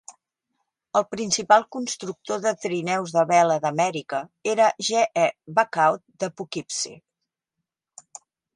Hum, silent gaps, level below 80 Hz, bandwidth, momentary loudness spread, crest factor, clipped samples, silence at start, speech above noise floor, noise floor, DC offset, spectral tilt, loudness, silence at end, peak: none; none; -72 dBFS; 11.5 kHz; 12 LU; 22 dB; under 0.1%; 0.1 s; 61 dB; -84 dBFS; under 0.1%; -3 dB/octave; -23 LUFS; 1.6 s; -4 dBFS